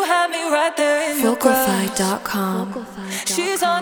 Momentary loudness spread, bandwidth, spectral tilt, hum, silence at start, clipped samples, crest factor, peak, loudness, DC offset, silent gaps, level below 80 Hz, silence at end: 9 LU; over 20 kHz; -3.5 dB/octave; none; 0 s; under 0.1%; 18 dB; -2 dBFS; -19 LUFS; under 0.1%; none; -56 dBFS; 0 s